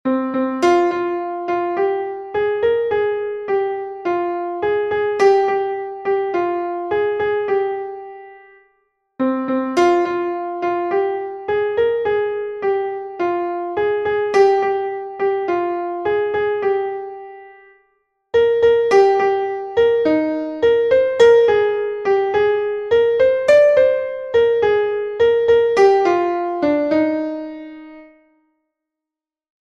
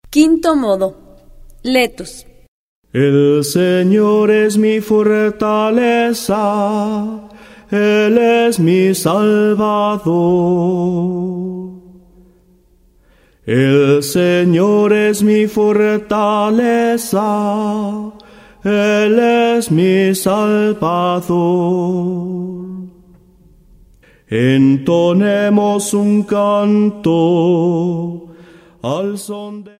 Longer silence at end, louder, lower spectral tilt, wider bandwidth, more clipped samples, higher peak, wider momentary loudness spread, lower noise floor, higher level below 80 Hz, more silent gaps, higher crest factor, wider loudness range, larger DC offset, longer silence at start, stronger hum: first, 1.6 s vs 0.1 s; second, -18 LUFS vs -14 LUFS; about the same, -5 dB/octave vs -6 dB/octave; second, 8.8 kHz vs 16 kHz; neither; about the same, -2 dBFS vs 0 dBFS; about the same, 10 LU vs 11 LU; first, -87 dBFS vs -51 dBFS; about the same, -54 dBFS vs -50 dBFS; second, none vs 2.48-2.82 s; about the same, 16 dB vs 14 dB; about the same, 7 LU vs 5 LU; neither; about the same, 0.05 s vs 0.1 s; neither